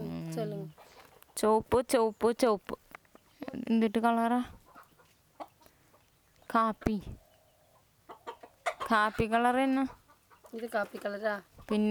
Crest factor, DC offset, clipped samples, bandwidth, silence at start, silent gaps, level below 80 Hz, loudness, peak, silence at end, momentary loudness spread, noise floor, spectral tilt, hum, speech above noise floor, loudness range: 20 dB; under 0.1%; under 0.1%; over 20 kHz; 0 s; none; -56 dBFS; -31 LUFS; -12 dBFS; 0 s; 20 LU; -66 dBFS; -5.5 dB/octave; none; 36 dB; 7 LU